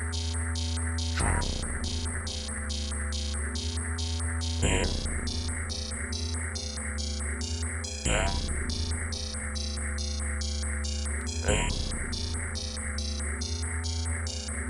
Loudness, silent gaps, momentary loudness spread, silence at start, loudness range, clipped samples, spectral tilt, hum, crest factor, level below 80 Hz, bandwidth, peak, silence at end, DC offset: -31 LUFS; none; 5 LU; 0 s; 1 LU; under 0.1%; -3.5 dB/octave; none; 18 dB; -34 dBFS; 10.5 kHz; -12 dBFS; 0 s; under 0.1%